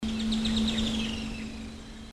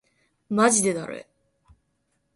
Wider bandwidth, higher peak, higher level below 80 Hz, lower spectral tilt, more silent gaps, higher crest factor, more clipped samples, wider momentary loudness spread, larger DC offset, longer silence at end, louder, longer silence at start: about the same, 12.5 kHz vs 11.5 kHz; second, -16 dBFS vs -6 dBFS; first, -42 dBFS vs -66 dBFS; about the same, -4.5 dB/octave vs -3.5 dB/octave; neither; second, 14 dB vs 22 dB; neither; second, 14 LU vs 18 LU; neither; second, 0 s vs 1.15 s; second, -30 LUFS vs -22 LUFS; second, 0 s vs 0.5 s